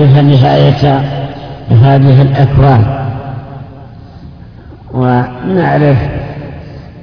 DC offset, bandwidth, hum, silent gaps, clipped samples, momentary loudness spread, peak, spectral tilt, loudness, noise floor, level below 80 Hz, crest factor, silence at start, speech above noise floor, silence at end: under 0.1%; 5.4 kHz; none; none; 0.6%; 19 LU; 0 dBFS; -9.5 dB/octave; -9 LUFS; -31 dBFS; -30 dBFS; 10 dB; 0 s; 24 dB; 0.05 s